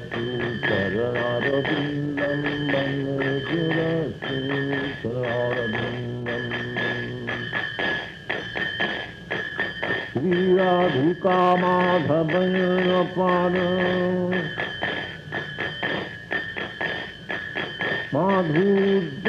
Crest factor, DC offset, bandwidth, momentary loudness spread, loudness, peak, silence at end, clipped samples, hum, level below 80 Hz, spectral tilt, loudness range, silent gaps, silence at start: 16 dB; under 0.1%; 8 kHz; 9 LU; -24 LUFS; -8 dBFS; 0 s; under 0.1%; none; -54 dBFS; -7.5 dB/octave; 6 LU; none; 0 s